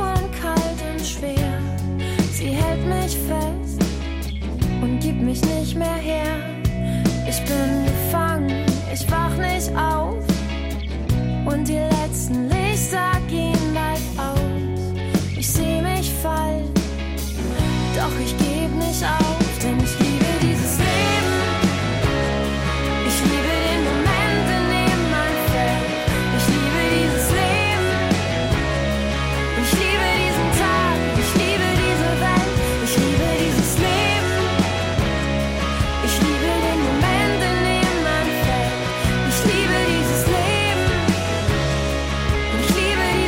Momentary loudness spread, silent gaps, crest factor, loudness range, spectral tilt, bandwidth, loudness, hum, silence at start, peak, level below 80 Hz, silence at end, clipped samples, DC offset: 5 LU; none; 12 dB; 4 LU; -5 dB/octave; 16.5 kHz; -20 LUFS; none; 0 s; -6 dBFS; -28 dBFS; 0 s; under 0.1%; under 0.1%